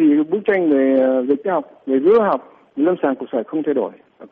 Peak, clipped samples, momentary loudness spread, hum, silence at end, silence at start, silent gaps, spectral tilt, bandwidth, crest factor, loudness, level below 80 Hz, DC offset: -6 dBFS; under 0.1%; 9 LU; none; 0.05 s; 0 s; none; -9.5 dB/octave; 4.2 kHz; 12 dB; -18 LUFS; -66 dBFS; under 0.1%